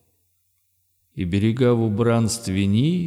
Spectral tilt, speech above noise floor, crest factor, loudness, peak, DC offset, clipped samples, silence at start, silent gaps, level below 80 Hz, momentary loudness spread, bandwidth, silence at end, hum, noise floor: -6.5 dB/octave; 48 dB; 14 dB; -21 LUFS; -8 dBFS; under 0.1%; under 0.1%; 1.15 s; none; -52 dBFS; 7 LU; 14.5 kHz; 0 s; none; -68 dBFS